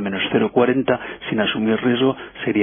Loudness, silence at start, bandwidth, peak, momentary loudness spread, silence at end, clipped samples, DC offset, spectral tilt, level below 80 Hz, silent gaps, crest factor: -20 LUFS; 0 s; 3.6 kHz; -4 dBFS; 6 LU; 0 s; under 0.1%; under 0.1%; -10 dB/octave; -54 dBFS; none; 16 dB